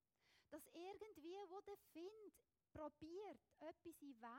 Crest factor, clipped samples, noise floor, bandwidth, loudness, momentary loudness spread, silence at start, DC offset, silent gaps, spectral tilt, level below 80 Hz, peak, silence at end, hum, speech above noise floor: 16 dB; under 0.1%; -82 dBFS; 16.5 kHz; -59 LUFS; 6 LU; 0.25 s; under 0.1%; none; -5 dB/octave; -86 dBFS; -42 dBFS; 0 s; none; 23 dB